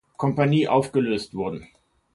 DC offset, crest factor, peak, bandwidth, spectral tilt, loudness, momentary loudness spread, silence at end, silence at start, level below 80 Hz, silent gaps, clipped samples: under 0.1%; 18 dB; -6 dBFS; 11.5 kHz; -7 dB/octave; -23 LUFS; 11 LU; 0.5 s; 0.2 s; -58 dBFS; none; under 0.1%